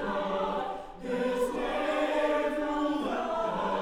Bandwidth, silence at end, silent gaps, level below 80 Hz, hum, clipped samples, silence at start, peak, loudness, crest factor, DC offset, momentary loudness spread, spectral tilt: 16 kHz; 0 s; none; -52 dBFS; none; under 0.1%; 0 s; -18 dBFS; -30 LUFS; 12 dB; under 0.1%; 6 LU; -5 dB/octave